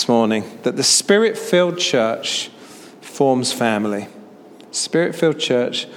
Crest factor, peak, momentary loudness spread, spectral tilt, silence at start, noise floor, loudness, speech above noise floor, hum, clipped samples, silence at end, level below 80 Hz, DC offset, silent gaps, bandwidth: 18 dB; -2 dBFS; 13 LU; -3 dB/octave; 0 s; -42 dBFS; -18 LUFS; 24 dB; none; under 0.1%; 0 s; -70 dBFS; under 0.1%; none; 17.5 kHz